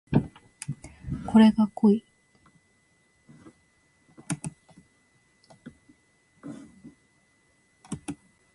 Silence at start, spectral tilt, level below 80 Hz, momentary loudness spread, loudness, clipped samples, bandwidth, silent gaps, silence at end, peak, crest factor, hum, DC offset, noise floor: 0.1 s; -7 dB/octave; -54 dBFS; 25 LU; -25 LUFS; under 0.1%; 11.5 kHz; none; 0.4 s; -8 dBFS; 22 dB; none; under 0.1%; -66 dBFS